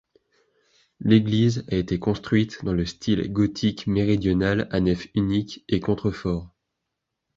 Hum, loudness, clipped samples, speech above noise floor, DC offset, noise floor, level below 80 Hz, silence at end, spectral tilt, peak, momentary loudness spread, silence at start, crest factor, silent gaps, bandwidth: none; -24 LUFS; under 0.1%; 59 dB; under 0.1%; -81 dBFS; -44 dBFS; 0.9 s; -7 dB/octave; -4 dBFS; 7 LU; 1 s; 20 dB; none; 7.6 kHz